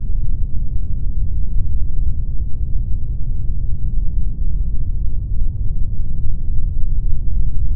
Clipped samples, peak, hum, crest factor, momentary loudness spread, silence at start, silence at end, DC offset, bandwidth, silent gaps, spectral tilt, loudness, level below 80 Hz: under 0.1%; -2 dBFS; none; 10 dB; 2 LU; 0 s; 0 s; under 0.1%; 0.6 kHz; none; -18 dB/octave; -25 LUFS; -18 dBFS